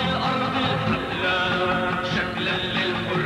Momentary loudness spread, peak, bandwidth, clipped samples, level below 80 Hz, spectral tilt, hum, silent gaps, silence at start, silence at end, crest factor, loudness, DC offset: 2 LU; -10 dBFS; 13.5 kHz; under 0.1%; -48 dBFS; -5.5 dB/octave; none; none; 0 s; 0 s; 14 dB; -23 LUFS; under 0.1%